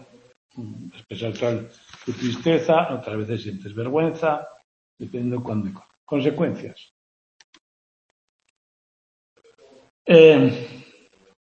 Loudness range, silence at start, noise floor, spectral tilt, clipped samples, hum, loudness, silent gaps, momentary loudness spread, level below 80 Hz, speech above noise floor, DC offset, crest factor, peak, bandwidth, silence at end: 11 LU; 0.55 s; -54 dBFS; -7 dB/octave; under 0.1%; none; -20 LUFS; 4.64-4.97 s, 5.97-6.07 s, 6.91-7.53 s, 7.61-8.39 s, 8.50-9.36 s, 9.90-10.05 s; 24 LU; -66 dBFS; 34 dB; under 0.1%; 22 dB; 0 dBFS; 7 kHz; 0.6 s